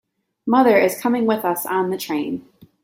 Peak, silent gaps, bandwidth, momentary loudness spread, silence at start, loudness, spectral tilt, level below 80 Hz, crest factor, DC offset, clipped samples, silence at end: -2 dBFS; none; 16.5 kHz; 13 LU; 0.45 s; -19 LUFS; -5 dB/octave; -64 dBFS; 18 dB; under 0.1%; under 0.1%; 0.45 s